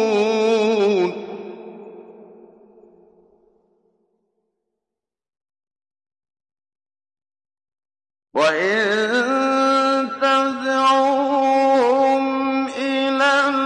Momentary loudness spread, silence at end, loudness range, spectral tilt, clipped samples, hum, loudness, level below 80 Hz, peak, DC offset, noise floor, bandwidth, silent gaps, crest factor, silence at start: 9 LU; 0 s; 10 LU; -4 dB/octave; under 0.1%; none; -18 LUFS; -72 dBFS; -6 dBFS; under 0.1%; -86 dBFS; 11 kHz; none; 16 dB; 0 s